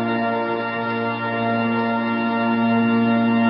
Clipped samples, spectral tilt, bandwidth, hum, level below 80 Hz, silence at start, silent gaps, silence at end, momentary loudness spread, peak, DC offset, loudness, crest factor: under 0.1%; -11.5 dB/octave; 5.6 kHz; none; -68 dBFS; 0 s; none; 0 s; 5 LU; -8 dBFS; under 0.1%; -20 LUFS; 12 dB